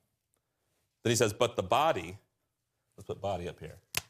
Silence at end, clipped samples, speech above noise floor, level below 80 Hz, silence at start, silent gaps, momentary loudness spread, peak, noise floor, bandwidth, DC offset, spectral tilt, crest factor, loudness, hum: 0.1 s; under 0.1%; 51 dB; -68 dBFS; 1.05 s; none; 16 LU; -12 dBFS; -82 dBFS; 15.5 kHz; under 0.1%; -4 dB/octave; 22 dB; -31 LUFS; none